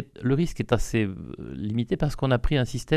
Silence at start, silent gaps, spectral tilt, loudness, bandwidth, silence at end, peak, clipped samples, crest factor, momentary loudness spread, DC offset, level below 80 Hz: 0 s; none; -6.5 dB/octave; -26 LUFS; 14 kHz; 0 s; -4 dBFS; under 0.1%; 22 dB; 9 LU; under 0.1%; -36 dBFS